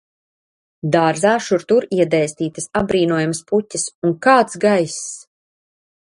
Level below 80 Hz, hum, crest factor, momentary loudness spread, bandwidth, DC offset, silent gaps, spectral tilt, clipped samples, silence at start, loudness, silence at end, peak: -54 dBFS; none; 18 dB; 10 LU; 11.5 kHz; under 0.1%; 3.95-4.02 s; -5 dB/octave; under 0.1%; 0.85 s; -17 LUFS; 0.9 s; 0 dBFS